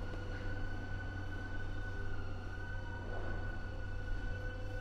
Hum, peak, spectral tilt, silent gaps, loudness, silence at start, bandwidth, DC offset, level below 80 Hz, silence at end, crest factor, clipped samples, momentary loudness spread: none; -28 dBFS; -6.5 dB/octave; none; -44 LUFS; 0 s; 7.6 kHz; under 0.1%; -42 dBFS; 0 s; 12 dB; under 0.1%; 2 LU